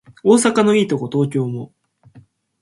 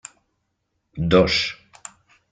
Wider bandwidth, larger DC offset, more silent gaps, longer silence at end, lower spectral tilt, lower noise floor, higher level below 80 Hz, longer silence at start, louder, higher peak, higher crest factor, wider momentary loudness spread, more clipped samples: first, 11.5 kHz vs 9.4 kHz; neither; neither; second, 0.4 s vs 0.8 s; about the same, -5.5 dB/octave vs -5 dB/octave; second, -49 dBFS vs -74 dBFS; second, -62 dBFS vs -46 dBFS; second, 0.25 s vs 0.95 s; first, -16 LUFS vs -19 LUFS; first, 0 dBFS vs -4 dBFS; about the same, 18 dB vs 22 dB; second, 14 LU vs 25 LU; neither